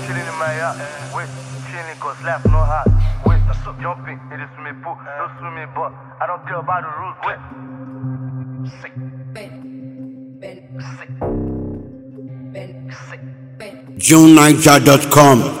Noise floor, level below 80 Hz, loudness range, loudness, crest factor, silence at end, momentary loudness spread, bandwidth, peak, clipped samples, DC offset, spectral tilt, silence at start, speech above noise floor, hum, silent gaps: -35 dBFS; -28 dBFS; 17 LU; -14 LUFS; 16 dB; 0 s; 25 LU; over 20 kHz; 0 dBFS; 0.4%; under 0.1%; -5 dB/octave; 0 s; 20 dB; none; none